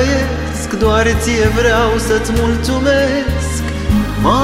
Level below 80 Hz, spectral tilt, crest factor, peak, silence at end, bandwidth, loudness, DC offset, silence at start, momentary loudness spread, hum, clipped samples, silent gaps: -22 dBFS; -5 dB/octave; 12 dB; 0 dBFS; 0 s; 16 kHz; -14 LUFS; under 0.1%; 0 s; 7 LU; none; under 0.1%; none